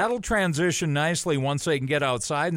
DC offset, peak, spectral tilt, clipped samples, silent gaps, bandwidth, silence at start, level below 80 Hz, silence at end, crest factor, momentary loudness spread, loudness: under 0.1%; -12 dBFS; -4.5 dB/octave; under 0.1%; none; 16 kHz; 0 s; -48 dBFS; 0 s; 12 dB; 2 LU; -24 LUFS